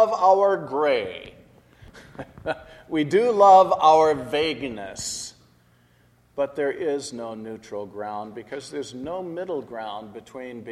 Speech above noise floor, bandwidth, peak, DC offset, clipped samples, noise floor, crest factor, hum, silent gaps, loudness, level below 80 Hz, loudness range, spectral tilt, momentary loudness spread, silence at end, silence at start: 37 dB; 13 kHz; -4 dBFS; under 0.1%; under 0.1%; -59 dBFS; 20 dB; none; none; -22 LUFS; -60 dBFS; 13 LU; -4 dB/octave; 20 LU; 0 s; 0 s